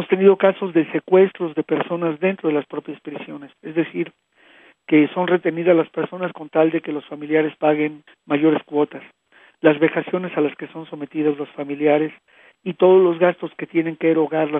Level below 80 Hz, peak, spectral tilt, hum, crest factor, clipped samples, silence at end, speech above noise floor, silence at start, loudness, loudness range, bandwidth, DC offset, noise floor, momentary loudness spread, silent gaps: -76 dBFS; 0 dBFS; -10 dB/octave; none; 20 dB; under 0.1%; 0 s; 32 dB; 0 s; -19 LUFS; 4 LU; 3.8 kHz; under 0.1%; -51 dBFS; 15 LU; none